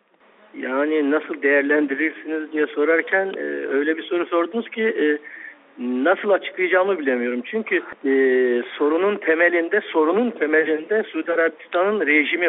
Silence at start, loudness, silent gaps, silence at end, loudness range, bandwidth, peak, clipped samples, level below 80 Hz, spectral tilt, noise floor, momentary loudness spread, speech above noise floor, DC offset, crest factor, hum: 0.55 s; -20 LUFS; none; 0 s; 3 LU; 4 kHz; -4 dBFS; under 0.1%; -72 dBFS; -2 dB/octave; -54 dBFS; 8 LU; 33 dB; under 0.1%; 16 dB; none